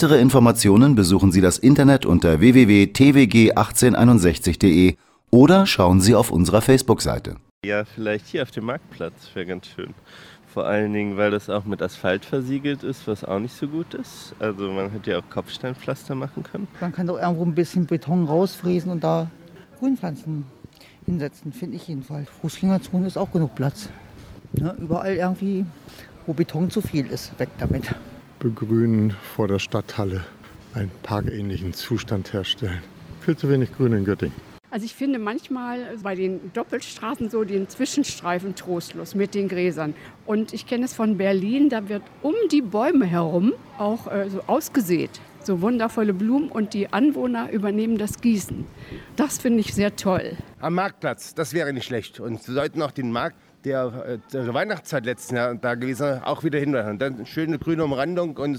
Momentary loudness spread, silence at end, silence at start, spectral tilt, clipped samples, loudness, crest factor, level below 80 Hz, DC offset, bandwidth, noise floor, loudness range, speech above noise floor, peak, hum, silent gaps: 17 LU; 0 s; 0 s; -6 dB/octave; under 0.1%; -21 LUFS; 20 dB; -46 dBFS; under 0.1%; 18 kHz; -47 dBFS; 12 LU; 26 dB; -2 dBFS; none; 7.51-7.61 s